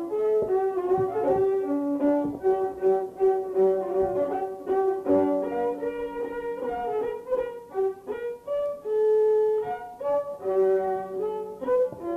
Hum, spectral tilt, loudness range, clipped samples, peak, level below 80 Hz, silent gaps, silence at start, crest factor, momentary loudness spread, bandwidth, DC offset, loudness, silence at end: none; -8 dB/octave; 4 LU; under 0.1%; -12 dBFS; -60 dBFS; none; 0 s; 14 dB; 8 LU; 4 kHz; under 0.1%; -26 LUFS; 0 s